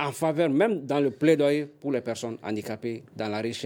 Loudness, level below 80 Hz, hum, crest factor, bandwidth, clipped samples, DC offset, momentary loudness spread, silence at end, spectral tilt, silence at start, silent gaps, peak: -27 LUFS; -74 dBFS; none; 18 dB; 17.5 kHz; under 0.1%; under 0.1%; 11 LU; 0 s; -6 dB/octave; 0 s; none; -8 dBFS